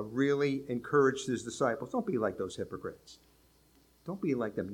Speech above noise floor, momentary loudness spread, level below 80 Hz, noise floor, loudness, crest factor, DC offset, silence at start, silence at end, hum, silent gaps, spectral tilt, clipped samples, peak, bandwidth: 33 dB; 15 LU; -68 dBFS; -65 dBFS; -32 LUFS; 18 dB; under 0.1%; 0 s; 0 s; none; none; -6 dB/octave; under 0.1%; -14 dBFS; 15.5 kHz